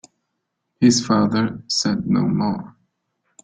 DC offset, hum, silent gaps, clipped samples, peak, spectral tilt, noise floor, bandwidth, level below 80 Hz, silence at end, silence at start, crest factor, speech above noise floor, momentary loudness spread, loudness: under 0.1%; none; none; under 0.1%; -4 dBFS; -5 dB/octave; -76 dBFS; 9.4 kHz; -56 dBFS; 0.75 s; 0.8 s; 18 dB; 58 dB; 6 LU; -19 LUFS